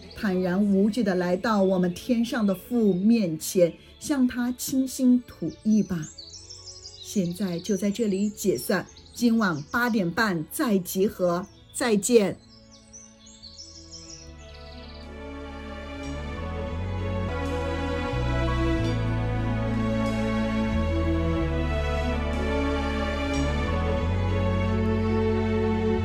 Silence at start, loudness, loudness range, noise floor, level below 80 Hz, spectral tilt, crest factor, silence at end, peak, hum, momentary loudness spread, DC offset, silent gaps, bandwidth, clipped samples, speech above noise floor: 0 s; -26 LUFS; 9 LU; -50 dBFS; -36 dBFS; -6 dB/octave; 18 dB; 0 s; -6 dBFS; none; 18 LU; under 0.1%; none; 17.5 kHz; under 0.1%; 26 dB